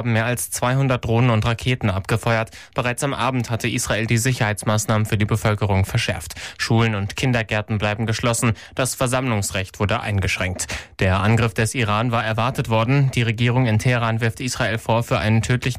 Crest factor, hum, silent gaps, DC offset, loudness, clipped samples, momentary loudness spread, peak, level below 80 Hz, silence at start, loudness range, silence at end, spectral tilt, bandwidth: 12 dB; none; none; under 0.1%; -20 LUFS; under 0.1%; 5 LU; -8 dBFS; -42 dBFS; 0 s; 2 LU; 0 s; -5 dB/octave; 15.5 kHz